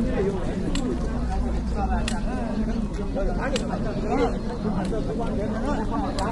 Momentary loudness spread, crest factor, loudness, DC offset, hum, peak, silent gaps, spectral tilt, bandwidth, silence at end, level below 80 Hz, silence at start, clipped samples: 3 LU; 16 dB; -27 LUFS; under 0.1%; none; -10 dBFS; none; -6.5 dB/octave; 11.5 kHz; 0 s; -30 dBFS; 0 s; under 0.1%